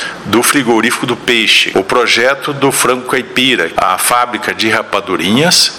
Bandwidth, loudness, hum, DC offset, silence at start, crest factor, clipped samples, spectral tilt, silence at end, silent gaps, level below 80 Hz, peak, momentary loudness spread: 19 kHz; -11 LUFS; none; 0.2%; 0 s; 12 dB; under 0.1%; -2.5 dB/octave; 0 s; none; -48 dBFS; 0 dBFS; 6 LU